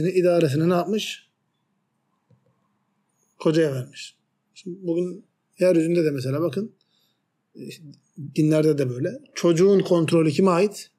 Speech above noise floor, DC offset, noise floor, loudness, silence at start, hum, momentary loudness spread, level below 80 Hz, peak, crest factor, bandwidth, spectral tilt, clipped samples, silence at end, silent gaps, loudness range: 51 dB; under 0.1%; -73 dBFS; -22 LUFS; 0 s; none; 21 LU; -72 dBFS; -8 dBFS; 16 dB; 14.5 kHz; -6.5 dB/octave; under 0.1%; 0.15 s; none; 8 LU